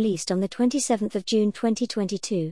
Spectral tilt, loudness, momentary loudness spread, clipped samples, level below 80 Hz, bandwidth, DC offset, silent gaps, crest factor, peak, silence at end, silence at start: -5 dB/octave; -25 LUFS; 4 LU; under 0.1%; -64 dBFS; 12 kHz; 0.2%; none; 14 dB; -10 dBFS; 0 s; 0 s